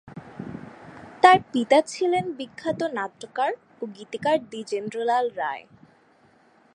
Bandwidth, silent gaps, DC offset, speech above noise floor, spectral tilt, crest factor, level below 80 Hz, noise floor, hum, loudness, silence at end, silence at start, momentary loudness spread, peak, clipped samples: 11 kHz; none; under 0.1%; 35 dB; -4.5 dB/octave; 24 dB; -66 dBFS; -59 dBFS; none; -24 LUFS; 1.15 s; 0.05 s; 20 LU; 0 dBFS; under 0.1%